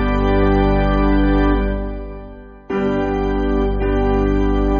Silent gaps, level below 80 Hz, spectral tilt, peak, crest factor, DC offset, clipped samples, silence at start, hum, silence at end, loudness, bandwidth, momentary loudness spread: none; -20 dBFS; -6.5 dB/octave; -2 dBFS; 14 dB; under 0.1%; under 0.1%; 0 s; 50 Hz at -25 dBFS; 0 s; -18 LUFS; 6.2 kHz; 12 LU